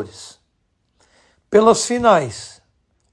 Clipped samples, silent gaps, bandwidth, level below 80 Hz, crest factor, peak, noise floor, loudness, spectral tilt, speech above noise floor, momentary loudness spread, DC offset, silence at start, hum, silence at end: under 0.1%; none; 11.5 kHz; -54 dBFS; 18 dB; -2 dBFS; -67 dBFS; -15 LUFS; -4 dB/octave; 51 dB; 23 LU; under 0.1%; 0 s; none; 0.65 s